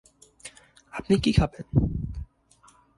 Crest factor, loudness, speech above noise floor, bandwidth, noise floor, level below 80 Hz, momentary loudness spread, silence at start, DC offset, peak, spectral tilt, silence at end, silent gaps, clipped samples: 20 dB; -25 LUFS; 35 dB; 11.5 kHz; -59 dBFS; -38 dBFS; 23 LU; 0.45 s; under 0.1%; -8 dBFS; -7 dB/octave; 0.75 s; none; under 0.1%